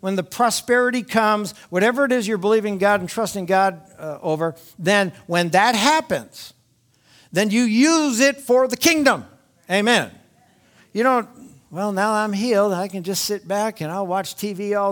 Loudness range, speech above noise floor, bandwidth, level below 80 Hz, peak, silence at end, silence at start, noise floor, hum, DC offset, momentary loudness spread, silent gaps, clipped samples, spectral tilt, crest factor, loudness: 4 LU; 41 dB; 19.5 kHz; -64 dBFS; 0 dBFS; 0 s; 0.05 s; -61 dBFS; none; under 0.1%; 11 LU; none; under 0.1%; -4 dB/octave; 20 dB; -20 LUFS